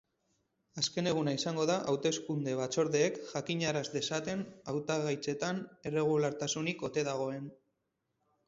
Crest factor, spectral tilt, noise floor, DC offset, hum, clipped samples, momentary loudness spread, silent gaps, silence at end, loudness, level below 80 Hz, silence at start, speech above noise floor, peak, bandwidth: 18 dB; -4.5 dB/octave; -83 dBFS; under 0.1%; none; under 0.1%; 8 LU; none; 0.95 s; -34 LUFS; -72 dBFS; 0.75 s; 49 dB; -16 dBFS; 8 kHz